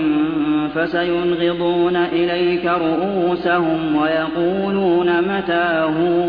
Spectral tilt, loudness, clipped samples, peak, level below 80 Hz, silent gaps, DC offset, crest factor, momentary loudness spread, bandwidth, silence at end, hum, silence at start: -9 dB/octave; -18 LUFS; under 0.1%; -6 dBFS; -50 dBFS; none; under 0.1%; 12 dB; 2 LU; 5 kHz; 0 s; none; 0 s